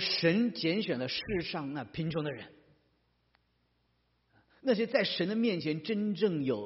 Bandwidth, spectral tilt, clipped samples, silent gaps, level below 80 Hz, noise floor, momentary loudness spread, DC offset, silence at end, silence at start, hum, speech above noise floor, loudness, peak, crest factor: 6 kHz; -4 dB/octave; under 0.1%; none; -64 dBFS; -75 dBFS; 9 LU; under 0.1%; 0 s; 0 s; 60 Hz at -65 dBFS; 43 dB; -32 LUFS; -14 dBFS; 20 dB